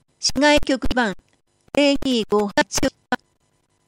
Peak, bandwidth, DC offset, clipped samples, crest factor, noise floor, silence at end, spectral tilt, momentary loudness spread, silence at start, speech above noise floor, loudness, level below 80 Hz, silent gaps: -2 dBFS; 16 kHz; under 0.1%; under 0.1%; 18 dB; -66 dBFS; 0.75 s; -3 dB/octave; 12 LU; 0.2 s; 47 dB; -20 LUFS; -40 dBFS; none